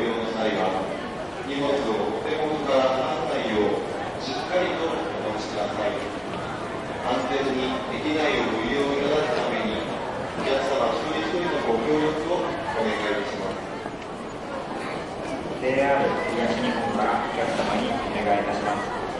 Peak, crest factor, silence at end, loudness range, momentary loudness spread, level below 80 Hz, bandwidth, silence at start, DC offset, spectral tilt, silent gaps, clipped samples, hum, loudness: -10 dBFS; 16 dB; 0 s; 3 LU; 8 LU; -50 dBFS; 11.5 kHz; 0 s; under 0.1%; -5 dB/octave; none; under 0.1%; none; -26 LUFS